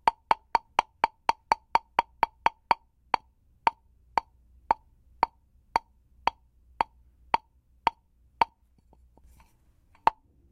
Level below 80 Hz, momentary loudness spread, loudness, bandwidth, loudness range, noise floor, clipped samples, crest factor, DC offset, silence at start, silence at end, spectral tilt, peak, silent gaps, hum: -58 dBFS; 5 LU; -30 LUFS; 14 kHz; 5 LU; -63 dBFS; under 0.1%; 28 dB; under 0.1%; 0.05 s; 0.4 s; -3 dB/octave; -2 dBFS; none; none